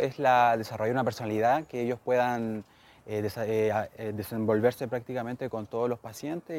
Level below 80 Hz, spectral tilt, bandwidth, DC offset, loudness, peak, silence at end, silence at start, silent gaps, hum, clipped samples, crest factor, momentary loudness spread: -66 dBFS; -6.5 dB/octave; 16.5 kHz; under 0.1%; -29 LUFS; -12 dBFS; 0 s; 0 s; none; none; under 0.1%; 18 dB; 12 LU